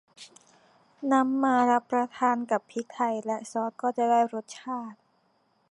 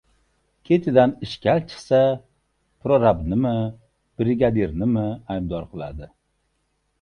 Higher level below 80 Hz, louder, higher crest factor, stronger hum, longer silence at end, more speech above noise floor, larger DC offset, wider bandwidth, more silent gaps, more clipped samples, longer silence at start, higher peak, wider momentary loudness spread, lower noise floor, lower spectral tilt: second, -84 dBFS vs -44 dBFS; second, -27 LUFS vs -21 LUFS; about the same, 18 dB vs 20 dB; neither; second, 0.8 s vs 0.95 s; second, 42 dB vs 50 dB; neither; about the same, 11 kHz vs 10.5 kHz; neither; neither; second, 0.2 s vs 0.7 s; second, -10 dBFS vs -2 dBFS; about the same, 13 LU vs 14 LU; about the same, -69 dBFS vs -71 dBFS; second, -4.5 dB/octave vs -8 dB/octave